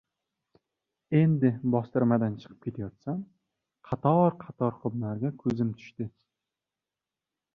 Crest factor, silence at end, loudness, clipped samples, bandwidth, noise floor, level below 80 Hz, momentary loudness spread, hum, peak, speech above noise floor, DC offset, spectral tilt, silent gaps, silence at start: 20 dB; 1.45 s; -28 LUFS; under 0.1%; 6.2 kHz; -90 dBFS; -64 dBFS; 15 LU; none; -10 dBFS; 62 dB; under 0.1%; -10.5 dB/octave; none; 1.1 s